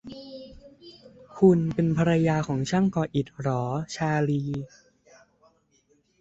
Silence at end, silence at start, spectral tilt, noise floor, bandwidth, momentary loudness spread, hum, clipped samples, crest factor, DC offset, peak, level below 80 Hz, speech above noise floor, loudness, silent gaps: 1.55 s; 0.05 s; -7.5 dB/octave; -66 dBFS; 8 kHz; 21 LU; none; under 0.1%; 20 dB; under 0.1%; -6 dBFS; -56 dBFS; 42 dB; -25 LUFS; none